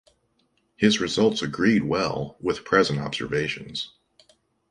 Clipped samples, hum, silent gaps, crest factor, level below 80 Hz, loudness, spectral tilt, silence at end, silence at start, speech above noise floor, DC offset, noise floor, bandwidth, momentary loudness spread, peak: under 0.1%; none; none; 20 dB; -54 dBFS; -24 LUFS; -5 dB/octave; 0.85 s; 0.8 s; 45 dB; under 0.1%; -69 dBFS; 11 kHz; 10 LU; -4 dBFS